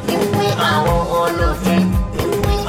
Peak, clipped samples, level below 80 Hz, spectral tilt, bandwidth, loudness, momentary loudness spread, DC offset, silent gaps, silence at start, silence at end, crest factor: -4 dBFS; under 0.1%; -24 dBFS; -5.5 dB/octave; 17 kHz; -17 LUFS; 3 LU; under 0.1%; none; 0 s; 0 s; 12 dB